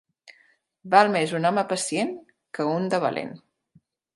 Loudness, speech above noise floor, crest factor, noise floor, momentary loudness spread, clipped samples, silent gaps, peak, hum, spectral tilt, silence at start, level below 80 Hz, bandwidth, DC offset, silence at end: -23 LUFS; 40 dB; 24 dB; -63 dBFS; 17 LU; under 0.1%; none; -2 dBFS; none; -4.5 dB/octave; 0.85 s; -76 dBFS; 11.5 kHz; under 0.1%; 0.8 s